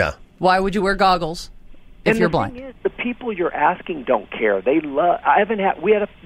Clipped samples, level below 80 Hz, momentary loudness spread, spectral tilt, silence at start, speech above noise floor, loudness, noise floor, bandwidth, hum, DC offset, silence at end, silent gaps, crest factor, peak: under 0.1%; -40 dBFS; 10 LU; -6 dB/octave; 0 s; 21 dB; -19 LUFS; -40 dBFS; 16 kHz; none; under 0.1%; 0.2 s; none; 18 dB; -2 dBFS